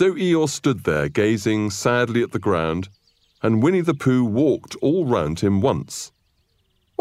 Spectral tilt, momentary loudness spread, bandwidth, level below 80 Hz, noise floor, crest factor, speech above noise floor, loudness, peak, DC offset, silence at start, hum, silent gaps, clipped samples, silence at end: -6 dB/octave; 8 LU; 15 kHz; -50 dBFS; -66 dBFS; 14 dB; 46 dB; -20 LUFS; -6 dBFS; under 0.1%; 0 s; none; none; under 0.1%; 0.95 s